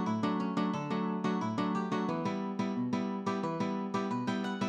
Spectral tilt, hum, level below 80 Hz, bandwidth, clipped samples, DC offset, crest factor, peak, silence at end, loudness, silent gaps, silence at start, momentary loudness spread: -7 dB/octave; none; -78 dBFS; 9 kHz; under 0.1%; under 0.1%; 12 dB; -20 dBFS; 0 s; -34 LUFS; none; 0 s; 2 LU